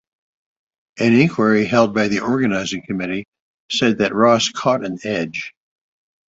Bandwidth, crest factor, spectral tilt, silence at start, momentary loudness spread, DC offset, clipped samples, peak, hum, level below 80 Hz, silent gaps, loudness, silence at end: 8 kHz; 18 dB; -5 dB/octave; 0.95 s; 10 LU; under 0.1%; under 0.1%; -2 dBFS; none; -56 dBFS; 3.28-3.32 s, 3.40-3.69 s; -18 LUFS; 0.8 s